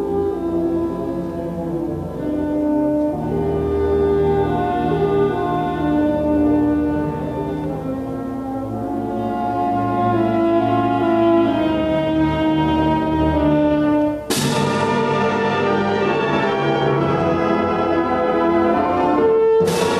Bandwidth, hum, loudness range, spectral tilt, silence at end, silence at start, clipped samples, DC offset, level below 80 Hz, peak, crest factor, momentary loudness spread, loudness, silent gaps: 13.5 kHz; none; 4 LU; -6.5 dB/octave; 0 s; 0 s; under 0.1%; under 0.1%; -38 dBFS; -4 dBFS; 14 dB; 8 LU; -19 LUFS; none